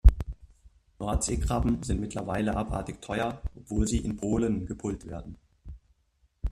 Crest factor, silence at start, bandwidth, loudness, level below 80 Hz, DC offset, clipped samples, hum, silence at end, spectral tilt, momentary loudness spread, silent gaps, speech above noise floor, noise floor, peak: 24 dB; 0.05 s; 13 kHz; -31 LUFS; -32 dBFS; under 0.1%; under 0.1%; none; 0 s; -6 dB/octave; 18 LU; none; 40 dB; -69 dBFS; -4 dBFS